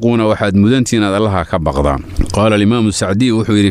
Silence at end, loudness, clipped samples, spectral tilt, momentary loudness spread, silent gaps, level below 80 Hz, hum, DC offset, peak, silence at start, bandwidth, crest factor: 0 s; -13 LUFS; under 0.1%; -6 dB/octave; 5 LU; none; -28 dBFS; none; under 0.1%; -2 dBFS; 0 s; 13 kHz; 10 dB